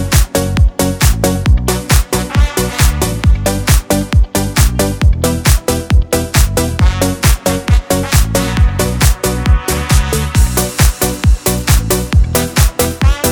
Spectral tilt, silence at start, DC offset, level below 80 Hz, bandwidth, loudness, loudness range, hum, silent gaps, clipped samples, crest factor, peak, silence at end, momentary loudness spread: -4.5 dB/octave; 0 s; under 0.1%; -14 dBFS; over 20 kHz; -13 LUFS; 0 LU; none; none; under 0.1%; 12 dB; 0 dBFS; 0 s; 2 LU